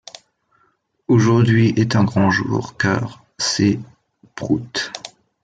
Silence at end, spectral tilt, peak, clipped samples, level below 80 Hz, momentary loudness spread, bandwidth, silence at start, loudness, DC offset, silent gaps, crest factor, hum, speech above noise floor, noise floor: 0.35 s; -5.5 dB/octave; -4 dBFS; under 0.1%; -54 dBFS; 19 LU; 9.2 kHz; 1.1 s; -18 LUFS; under 0.1%; none; 16 dB; none; 47 dB; -63 dBFS